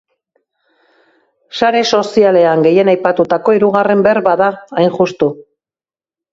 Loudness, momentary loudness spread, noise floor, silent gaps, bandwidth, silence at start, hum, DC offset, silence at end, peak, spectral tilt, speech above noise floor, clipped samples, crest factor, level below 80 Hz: -12 LUFS; 6 LU; under -90 dBFS; none; 7.8 kHz; 1.55 s; none; under 0.1%; 0.9 s; 0 dBFS; -5.5 dB/octave; over 79 dB; under 0.1%; 14 dB; -56 dBFS